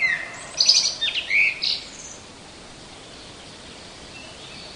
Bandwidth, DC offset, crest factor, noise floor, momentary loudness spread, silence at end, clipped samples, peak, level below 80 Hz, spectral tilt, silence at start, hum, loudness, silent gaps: 11 kHz; under 0.1%; 22 dB; -42 dBFS; 25 LU; 0 s; under 0.1%; -4 dBFS; -56 dBFS; 1 dB/octave; 0 s; none; -19 LUFS; none